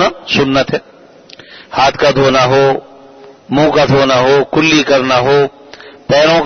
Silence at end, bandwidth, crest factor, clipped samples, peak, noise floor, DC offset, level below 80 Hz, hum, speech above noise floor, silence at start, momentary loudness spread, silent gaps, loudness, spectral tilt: 0 s; 6.6 kHz; 12 dB; under 0.1%; 0 dBFS; -38 dBFS; under 0.1%; -42 dBFS; none; 28 dB; 0 s; 9 LU; none; -11 LUFS; -5 dB/octave